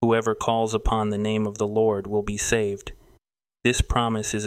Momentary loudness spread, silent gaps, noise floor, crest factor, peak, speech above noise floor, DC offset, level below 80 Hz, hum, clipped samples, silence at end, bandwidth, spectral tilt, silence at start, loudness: 4 LU; none; -67 dBFS; 18 dB; -6 dBFS; 43 dB; under 0.1%; -34 dBFS; none; under 0.1%; 0 s; 16 kHz; -4.5 dB/octave; 0 s; -24 LUFS